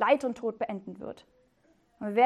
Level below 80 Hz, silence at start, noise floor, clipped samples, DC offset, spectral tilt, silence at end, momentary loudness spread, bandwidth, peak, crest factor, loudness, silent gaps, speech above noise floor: -72 dBFS; 0 s; -67 dBFS; under 0.1%; under 0.1%; -6 dB/octave; 0 s; 17 LU; 11 kHz; -10 dBFS; 20 dB; -33 LUFS; none; 36 dB